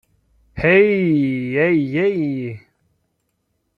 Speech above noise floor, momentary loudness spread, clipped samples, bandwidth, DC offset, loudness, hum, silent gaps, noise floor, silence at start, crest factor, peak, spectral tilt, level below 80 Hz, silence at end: 53 dB; 16 LU; under 0.1%; 5.6 kHz; under 0.1%; -17 LUFS; none; none; -70 dBFS; 0.55 s; 16 dB; -2 dBFS; -9 dB/octave; -48 dBFS; 1.2 s